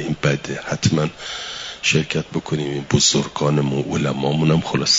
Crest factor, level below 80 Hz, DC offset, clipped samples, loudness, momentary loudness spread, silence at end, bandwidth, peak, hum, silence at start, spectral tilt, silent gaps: 18 dB; -48 dBFS; under 0.1%; under 0.1%; -20 LUFS; 9 LU; 0 s; 7.8 kHz; -2 dBFS; none; 0 s; -4 dB/octave; none